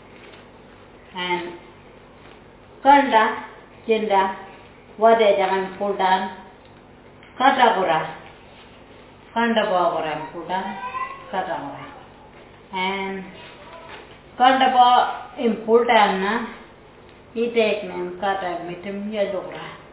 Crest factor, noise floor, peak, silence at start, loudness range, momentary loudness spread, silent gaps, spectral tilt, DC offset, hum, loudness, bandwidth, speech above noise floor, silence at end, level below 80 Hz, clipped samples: 20 dB; -46 dBFS; -2 dBFS; 0.15 s; 8 LU; 23 LU; none; -8.5 dB/octave; under 0.1%; none; -20 LUFS; 4 kHz; 27 dB; 0.1 s; -58 dBFS; under 0.1%